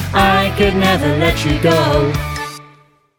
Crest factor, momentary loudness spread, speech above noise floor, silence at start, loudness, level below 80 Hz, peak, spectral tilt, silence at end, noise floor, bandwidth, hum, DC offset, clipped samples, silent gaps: 12 dB; 10 LU; 35 dB; 0 s; -14 LUFS; -28 dBFS; -2 dBFS; -5.5 dB/octave; 0.55 s; -49 dBFS; 18.5 kHz; none; under 0.1%; under 0.1%; none